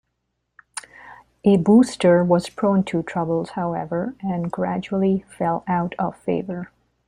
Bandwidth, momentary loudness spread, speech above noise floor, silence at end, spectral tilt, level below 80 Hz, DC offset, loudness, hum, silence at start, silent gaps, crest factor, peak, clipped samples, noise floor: 11 kHz; 16 LU; 55 dB; 0.45 s; -7 dB/octave; -56 dBFS; under 0.1%; -21 LUFS; none; 0.75 s; none; 18 dB; -4 dBFS; under 0.1%; -75 dBFS